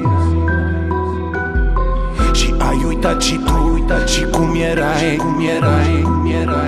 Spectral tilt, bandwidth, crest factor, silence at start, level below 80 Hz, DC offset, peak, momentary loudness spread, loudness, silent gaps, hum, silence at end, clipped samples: -5.5 dB/octave; 13.5 kHz; 12 dB; 0 s; -20 dBFS; under 0.1%; -2 dBFS; 4 LU; -16 LUFS; none; none; 0 s; under 0.1%